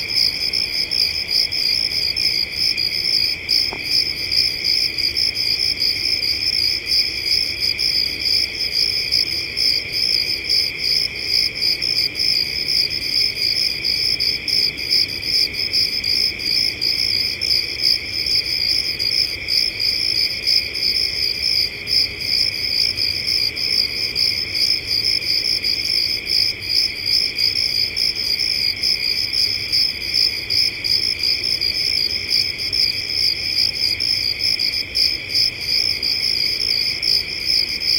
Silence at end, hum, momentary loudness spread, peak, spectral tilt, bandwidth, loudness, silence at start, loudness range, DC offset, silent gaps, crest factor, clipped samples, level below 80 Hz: 0 s; none; 1 LU; -4 dBFS; -0.5 dB/octave; 17 kHz; -16 LUFS; 0 s; 0 LU; under 0.1%; none; 16 dB; under 0.1%; -46 dBFS